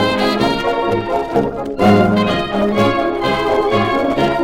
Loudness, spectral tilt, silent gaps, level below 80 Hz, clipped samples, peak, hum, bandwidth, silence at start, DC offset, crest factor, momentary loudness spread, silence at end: -15 LUFS; -6.5 dB/octave; none; -38 dBFS; under 0.1%; 0 dBFS; none; 16.5 kHz; 0 s; under 0.1%; 14 dB; 5 LU; 0 s